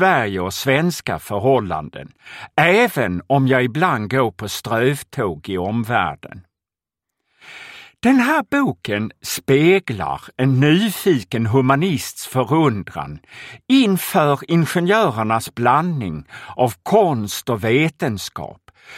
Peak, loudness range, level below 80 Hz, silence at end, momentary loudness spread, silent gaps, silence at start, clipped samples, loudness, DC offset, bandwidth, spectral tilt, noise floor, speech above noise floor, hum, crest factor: 0 dBFS; 4 LU; -52 dBFS; 0 s; 15 LU; none; 0 s; under 0.1%; -18 LUFS; under 0.1%; 16.5 kHz; -5.5 dB/octave; -88 dBFS; 70 dB; none; 18 dB